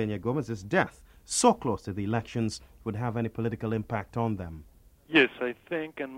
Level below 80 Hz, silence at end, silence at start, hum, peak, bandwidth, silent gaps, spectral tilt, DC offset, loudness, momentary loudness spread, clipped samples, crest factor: -56 dBFS; 0 s; 0 s; none; -8 dBFS; 16 kHz; none; -4.5 dB/octave; under 0.1%; -29 LUFS; 11 LU; under 0.1%; 22 dB